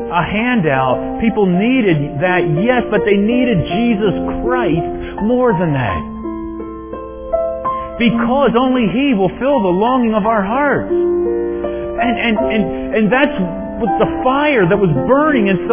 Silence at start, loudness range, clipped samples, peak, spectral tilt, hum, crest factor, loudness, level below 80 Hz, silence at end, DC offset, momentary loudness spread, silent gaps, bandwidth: 0 s; 4 LU; under 0.1%; 0 dBFS; -11 dB/octave; none; 14 dB; -15 LUFS; -36 dBFS; 0 s; under 0.1%; 8 LU; none; 3.6 kHz